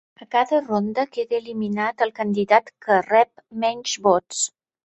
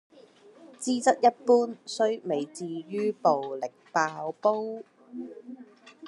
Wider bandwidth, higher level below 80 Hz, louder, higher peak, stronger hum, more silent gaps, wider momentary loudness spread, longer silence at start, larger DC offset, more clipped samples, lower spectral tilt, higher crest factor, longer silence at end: second, 8.4 kHz vs 11.5 kHz; first, -66 dBFS vs -88 dBFS; first, -22 LUFS vs -27 LUFS; first, -2 dBFS vs -8 dBFS; neither; neither; second, 7 LU vs 19 LU; second, 0.2 s vs 0.6 s; neither; neither; about the same, -3.5 dB/octave vs -4 dB/octave; about the same, 20 dB vs 20 dB; first, 0.35 s vs 0 s